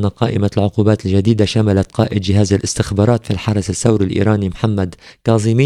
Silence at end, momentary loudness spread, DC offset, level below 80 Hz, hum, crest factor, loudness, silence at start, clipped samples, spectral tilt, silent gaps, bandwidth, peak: 0 s; 4 LU; under 0.1%; -40 dBFS; none; 14 dB; -16 LUFS; 0 s; under 0.1%; -6.5 dB/octave; none; 11.5 kHz; 0 dBFS